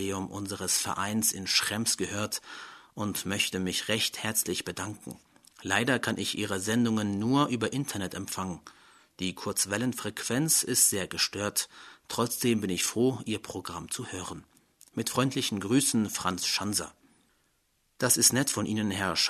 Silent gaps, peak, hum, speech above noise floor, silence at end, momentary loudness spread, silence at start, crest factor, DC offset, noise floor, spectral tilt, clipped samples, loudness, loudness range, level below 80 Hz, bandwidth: none; -8 dBFS; none; 43 dB; 0 s; 13 LU; 0 s; 22 dB; under 0.1%; -72 dBFS; -3 dB/octave; under 0.1%; -28 LUFS; 4 LU; -64 dBFS; 13.5 kHz